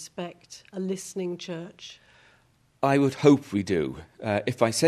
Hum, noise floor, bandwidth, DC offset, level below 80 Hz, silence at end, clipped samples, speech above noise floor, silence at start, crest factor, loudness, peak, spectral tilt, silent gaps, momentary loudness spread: none; -63 dBFS; 13.5 kHz; under 0.1%; -62 dBFS; 0 s; under 0.1%; 37 dB; 0 s; 22 dB; -26 LUFS; -4 dBFS; -5.5 dB/octave; none; 20 LU